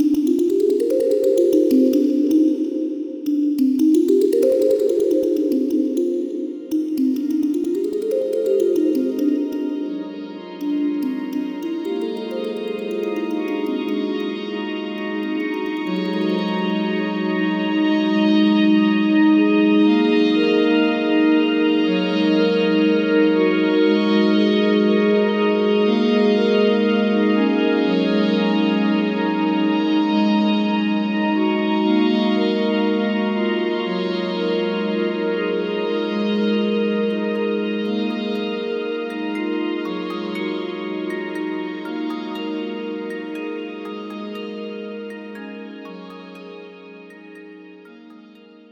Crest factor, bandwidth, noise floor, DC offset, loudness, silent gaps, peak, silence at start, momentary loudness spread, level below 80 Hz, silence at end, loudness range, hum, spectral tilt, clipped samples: 14 dB; 17.5 kHz; -45 dBFS; under 0.1%; -19 LUFS; none; -4 dBFS; 0 s; 12 LU; -72 dBFS; 0.5 s; 11 LU; none; -7 dB/octave; under 0.1%